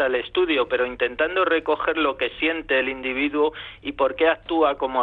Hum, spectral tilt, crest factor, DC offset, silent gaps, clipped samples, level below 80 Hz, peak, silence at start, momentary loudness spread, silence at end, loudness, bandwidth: none; -6.5 dB/octave; 14 dB; under 0.1%; none; under 0.1%; -52 dBFS; -8 dBFS; 0 s; 4 LU; 0 s; -22 LUFS; 4.7 kHz